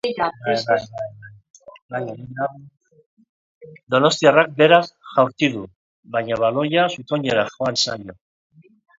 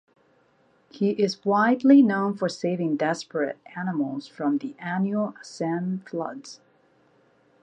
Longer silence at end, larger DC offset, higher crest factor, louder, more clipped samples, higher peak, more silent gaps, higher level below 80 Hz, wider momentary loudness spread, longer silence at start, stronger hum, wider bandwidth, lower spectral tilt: second, 0.85 s vs 1.05 s; neither; about the same, 20 dB vs 18 dB; first, -19 LUFS vs -25 LUFS; neither; first, 0 dBFS vs -6 dBFS; first, 1.50-1.54 s, 1.82-1.89 s, 3.06-3.17 s, 3.29-3.61 s, 3.83-3.87 s, 5.76-6.03 s vs none; first, -62 dBFS vs -76 dBFS; about the same, 17 LU vs 15 LU; second, 0.05 s vs 0.95 s; neither; second, 7.8 kHz vs 9 kHz; second, -4.5 dB/octave vs -6.5 dB/octave